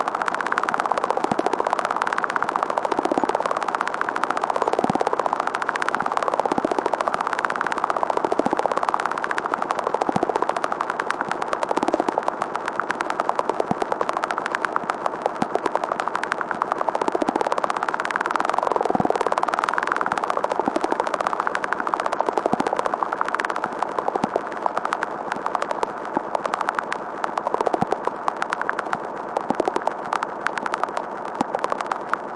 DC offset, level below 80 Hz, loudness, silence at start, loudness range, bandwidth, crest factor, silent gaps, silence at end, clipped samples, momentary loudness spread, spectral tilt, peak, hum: under 0.1%; -62 dBFS; -24 LUFS; 0 s; 3 LU; 11.5 kHz; 20 dB; none; 0 s; under 0.1%; 4 LU; -4.5 dB/octave; -2 dBFS; none